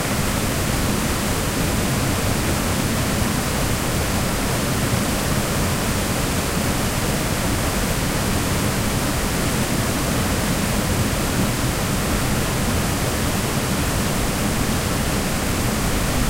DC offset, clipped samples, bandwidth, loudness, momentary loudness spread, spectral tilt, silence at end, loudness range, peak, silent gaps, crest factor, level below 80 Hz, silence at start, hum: under 0.1%; under 0.1%; 16 kHz; -21 LUFS; 1 LU; -4 dB/octave; 0 s; 0 LU; -6 dBFS; none; 14 dB; -30 dBFS; 0 s; none